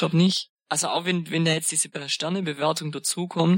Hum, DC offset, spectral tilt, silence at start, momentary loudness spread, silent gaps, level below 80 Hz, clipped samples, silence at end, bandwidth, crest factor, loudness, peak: none; under 0.1%; -4 dB/octave; 0 s; 6 LU; 0.50-0.57 s; -72 dBFS; under 0.1%; 0 s; 16.5 kHz; 16 dB; -24 LUFS; -8 dBFS